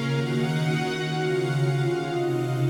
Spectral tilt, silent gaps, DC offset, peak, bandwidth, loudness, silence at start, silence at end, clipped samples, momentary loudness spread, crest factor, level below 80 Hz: -6.5 dB/octave; none; under 0.1%; -14 dBFS; 17 kHz; -25 LUFS; 0 s; 0 s; under 0.1%; 2 LU; 12 dB; -62 dBFS